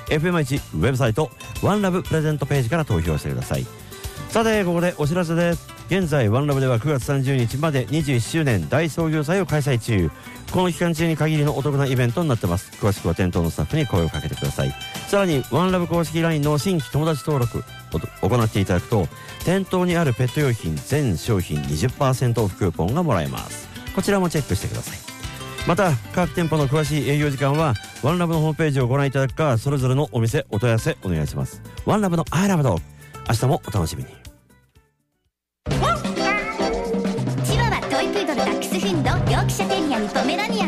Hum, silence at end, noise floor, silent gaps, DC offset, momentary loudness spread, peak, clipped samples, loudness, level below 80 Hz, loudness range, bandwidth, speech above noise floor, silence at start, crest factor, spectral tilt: none; 0 s; -74 dBFS; none; under 0.1%; 7 LU; -10 dBFS; under 0.1%; -22 LUFS; -40 dBFS; 3 LU; 15.5 kHz; 53 dB; 0 s; 12 dB; -6 dB/octave